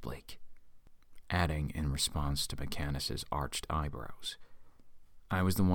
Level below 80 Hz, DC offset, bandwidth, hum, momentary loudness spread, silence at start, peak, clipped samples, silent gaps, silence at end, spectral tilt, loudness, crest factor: -44 dBFS; under 0.1%; 19 kHz; none; 13 LU; 0 s; -16 dBFS; under 0.1%; none; 0 s; -4.5 dB/octave; -36 LUFS; 20 dB